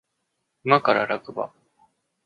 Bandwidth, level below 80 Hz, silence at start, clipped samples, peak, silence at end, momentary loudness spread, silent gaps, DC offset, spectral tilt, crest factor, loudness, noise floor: 10 kHz; -74 dBFS; 0.65 s; under 0.1%; -2 dBFS; 0.8 s; 14 LU; none; under 0.1%; -7 dB/octave; 24 dB; -23 LUFS; -77 dBFS